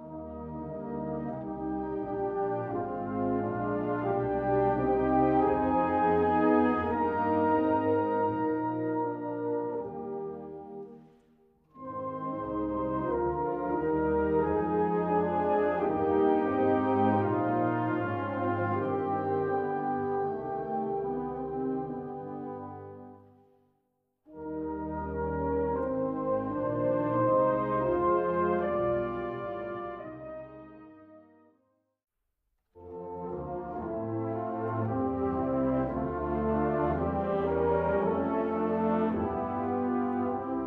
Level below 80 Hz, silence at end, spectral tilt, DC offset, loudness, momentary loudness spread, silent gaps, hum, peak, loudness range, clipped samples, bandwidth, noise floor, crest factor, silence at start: -52 dBFS; 0 s; -10.5 dB/octave; under 0.1%; -30 LUFS; 13 LU; none; none; -14 dBFS; 12 LU; under 0.1%; 4.8 kHz; -80 dBFS; 16 dB; 0 s